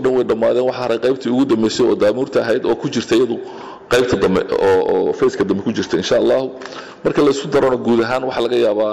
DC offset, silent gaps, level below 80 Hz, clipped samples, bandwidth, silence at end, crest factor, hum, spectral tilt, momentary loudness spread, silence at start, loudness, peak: 0.2%; none; -48 dBFS; under 0.1%; 13 kHz; 0 s; 8 dB; none; -5.5 dB/octave; 5 LU; 0 s; -16 LUFS; -8 dBFS